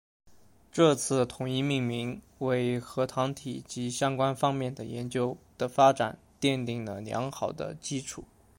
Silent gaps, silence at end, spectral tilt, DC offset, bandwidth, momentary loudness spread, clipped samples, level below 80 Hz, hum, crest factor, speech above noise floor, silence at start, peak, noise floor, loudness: none; 0.35 s; -5 dB/octave; under 0.1%; 16.5 kHz; 13 LU; under 0.1%; -62 dBFS; none; 20 dB; 25 dB; 0.25 s; -10 dBFS; -54 dBFS; -30 LUFS